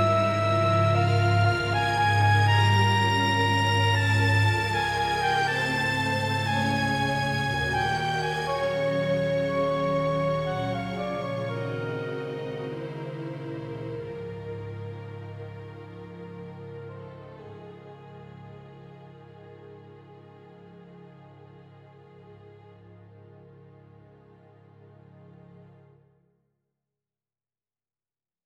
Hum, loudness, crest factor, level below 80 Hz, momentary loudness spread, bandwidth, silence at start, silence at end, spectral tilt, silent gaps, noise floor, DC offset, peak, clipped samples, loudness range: none; -25 LUFS; 18 dB; -54 dBFS; 22 LU; 13 kHz; 0 s; 2.85 s; -5.5 dB/octave; none; under -90 dBFS; under 0.1%; -10 dBFS; under 0.1%; 22 LU